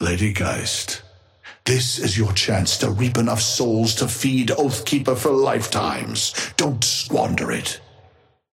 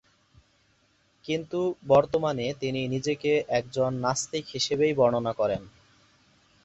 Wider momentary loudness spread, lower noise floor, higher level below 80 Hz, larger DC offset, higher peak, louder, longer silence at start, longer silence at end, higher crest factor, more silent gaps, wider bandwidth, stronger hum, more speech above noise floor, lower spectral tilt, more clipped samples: second, 5 LU vs 9 LU; second, -55 dBFS vs -66 dBFS; first, -48 dBFS vs -60 dBFS; neither; first, -4 dBFS vs -8 dBFS; first, -20 LUFS vs -27 LUFS; second, 0 s vs 1.25 s; second, 0.75 s vs 0.95 s; about the same, 18 dB vs 20 dB; neither; first, 16.5 kHz vs 8.2 kHz; neither; second, 34 dB vs 40 dB; about the same, -4 dB/octave vs -5 dB/octave; neither